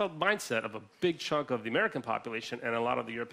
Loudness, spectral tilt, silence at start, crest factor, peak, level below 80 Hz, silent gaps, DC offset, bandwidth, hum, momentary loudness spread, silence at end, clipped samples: -32 LUFS; -4.5 dB/octave; 0 s; 20 dB; -12 dBFS; -72 dBFS; none; under 0.1%; 15.5 kHz; none; 6 LU; 0 s; under 0.1%